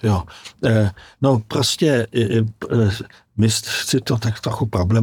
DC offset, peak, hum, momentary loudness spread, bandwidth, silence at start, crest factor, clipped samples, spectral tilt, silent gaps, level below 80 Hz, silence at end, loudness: under 0.1%; -4 dBFS; none; 6 LU; 18 kHz; 0.05 s; 16 dB; under 0.1%; -5.5 dB/octave; none; -48 dBFS; 0 s; -19 LUFS